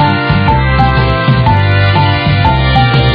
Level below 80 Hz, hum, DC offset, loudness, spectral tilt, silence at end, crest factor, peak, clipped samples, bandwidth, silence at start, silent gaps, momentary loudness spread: -18 dBFS; none; under 0.1%; -10 LUFS; -8.5 dB/octave; 0 s; 8 dB; 0 dBFS; 0.2%; 5.2 kHz; 0 s; none; 1 LU